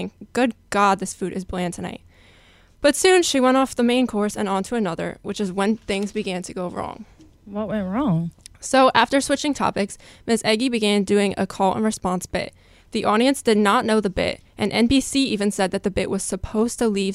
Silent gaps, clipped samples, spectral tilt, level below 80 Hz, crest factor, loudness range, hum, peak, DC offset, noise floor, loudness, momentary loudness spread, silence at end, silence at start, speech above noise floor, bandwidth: none; under 0.1%; -4.5 dB/octave; -46 dBFS; 20 dB; 5 LU; none; -2 dBFS; under 0.1%; -52 dBFS; -21 LUFS; 12 LU; 0 s; 0 s; 31 dB; 15.5 kHz